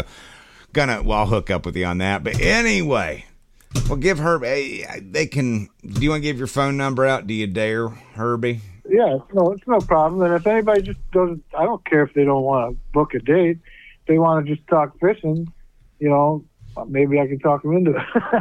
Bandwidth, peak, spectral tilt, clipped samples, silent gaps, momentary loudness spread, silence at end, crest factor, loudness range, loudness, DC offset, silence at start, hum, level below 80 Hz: 14 kHz; -4 dBFS; -6 dB/octave; under 0.1%; none; 10 LU; 0 s; 16 dB; 3 LU; -20 LUFS; under 0.1%; 0 s; none; -36 dBFS